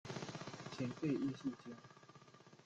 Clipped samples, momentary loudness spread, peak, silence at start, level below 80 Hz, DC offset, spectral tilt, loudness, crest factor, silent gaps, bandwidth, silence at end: under 0.1%; 22 LU; -28 dBFS; 0.05 s; -78 dBFS; under 0.1%; -6 dB/octave; -44 LUFS; 18 dB; none; 8.8 kHz; 0 s